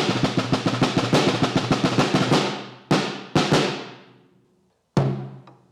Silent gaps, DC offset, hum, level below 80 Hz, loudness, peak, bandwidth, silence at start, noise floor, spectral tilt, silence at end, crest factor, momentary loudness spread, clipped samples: none; under 0.1%; none; -52 dBFS; -22 LUFS; -10 dBFS; 14 kHz; 0 s; -64 dBFS; -5.5 dB/octave; 0.2 s; 14 dB; 11 LU; under 0.1%